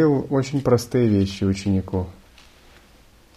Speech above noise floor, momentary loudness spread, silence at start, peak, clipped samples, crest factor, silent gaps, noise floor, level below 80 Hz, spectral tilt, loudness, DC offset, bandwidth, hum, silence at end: 32 dB; 9 LU; 0 s; -4 dBFS; under 0.1%; 18 dB; none; -52 dBFS; -48 dBFS; -7.5 dB/octave; -21 LUFS; under 0.1%; 14.5 kHz; none; 1.25 s